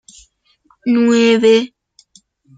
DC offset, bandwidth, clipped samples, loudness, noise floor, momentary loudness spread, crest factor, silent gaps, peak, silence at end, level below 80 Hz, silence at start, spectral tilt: under 0.1%; 9.2 kHz; under 0.1%; -13 LUFS; -57 dBFS; 13 LU; 14 dB; none; -2 dBFS; 0.9 s; -60 dBFS; 0.85 s; -4.5 dB/octave